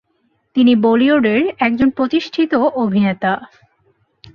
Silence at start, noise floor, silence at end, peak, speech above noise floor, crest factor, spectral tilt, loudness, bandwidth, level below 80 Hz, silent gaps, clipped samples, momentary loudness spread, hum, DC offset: 0.55 s; -64 dBFS; 0.9 s; -2 dBFS; 49 dB; 14 dB; -7.5 dB/octave; -15 LUFS; 6.6 kHz; -52 dBFS; none; under 0.1%; 7 LU; none; under 0.1%